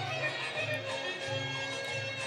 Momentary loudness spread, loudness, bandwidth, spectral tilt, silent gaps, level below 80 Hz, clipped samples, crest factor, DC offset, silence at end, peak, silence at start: 2 LU; -34 LUFS; over 20 kHz; -3.5 dB/octave; none; -72 dBFS; under 0.1%; 16 dB; under 0.1%; 0 s; -20 dBFS; 0 s